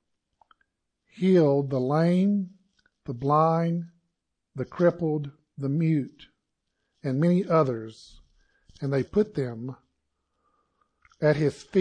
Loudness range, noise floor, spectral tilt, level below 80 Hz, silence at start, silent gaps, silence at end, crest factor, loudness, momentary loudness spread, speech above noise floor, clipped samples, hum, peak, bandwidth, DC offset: 5 LU; -80 dBFS; -9 dB/octave; -62 dBFS; 1.2 s; none; 0 s; 18 dB; -25 LUFS; 17 LU; 55 dB; under 0.1%; none; -8 dBFS; 9.4 kHz; under 0.1%